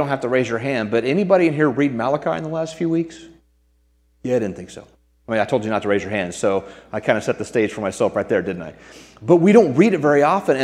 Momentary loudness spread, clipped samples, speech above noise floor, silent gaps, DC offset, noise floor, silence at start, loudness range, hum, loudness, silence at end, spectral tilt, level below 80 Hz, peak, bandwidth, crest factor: 13 LU; under 0.1%; 41 dB; none; under 0.1%; -60 dBFS; 0 s; 7 LU; none; -19 LUFS; 0 s; -6.5 dB/octave; -56 dBFS; 0 dBFS; 12 kHz; 20 dB